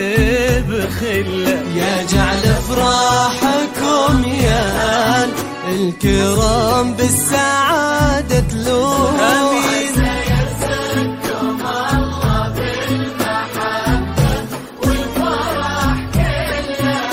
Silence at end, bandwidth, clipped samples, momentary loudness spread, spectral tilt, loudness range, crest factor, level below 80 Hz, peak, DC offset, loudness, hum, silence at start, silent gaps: 0 s; 16.5 kHz; under 0.1%; 6 LU; -4.5 dB/octave; 4 LU; 16 dB; -26 dBFS; 0 dBFS; under 0.1%; -16 LUFS; none; 0 s; none